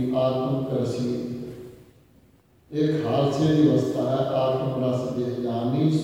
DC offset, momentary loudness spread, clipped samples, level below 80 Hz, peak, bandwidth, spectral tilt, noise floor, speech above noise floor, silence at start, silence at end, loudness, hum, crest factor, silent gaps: under 0.1%; 11 LU; under 0.1%; -58 dBFS; -8 dBFS; 15.5 kHz; -8 dB/octave; -58 dBFS; 35 dB; 0 s; 0 s; -24 LUFS; none; 16 dB; none